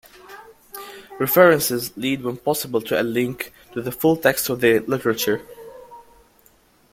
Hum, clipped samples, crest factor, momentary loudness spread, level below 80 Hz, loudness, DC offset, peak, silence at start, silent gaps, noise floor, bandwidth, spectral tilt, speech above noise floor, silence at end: none; under 0.1%; 20 dB; 23 LU; -58 dBFS; -20 LUFS; under 0.1%; -2 dBFS; 0.3 s; none; -56 dBFS; 16.5 kHz; -4.5 dB/octave; 37 dB; 0.95 s